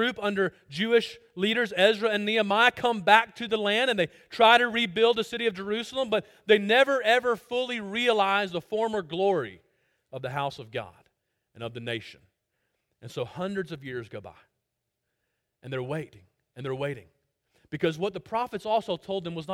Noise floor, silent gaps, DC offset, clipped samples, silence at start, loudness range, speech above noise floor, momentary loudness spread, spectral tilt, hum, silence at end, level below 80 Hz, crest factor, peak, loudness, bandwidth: -82 dBFS; none; under 0.1%; under 0.1%; 0 s; 15 LU; 56 dB; 16 LU; -4.5 dB/octave; none; 0 s; -68 dBFS; 24 dB; -2 dBFS; -26 LUFS; 16 kHz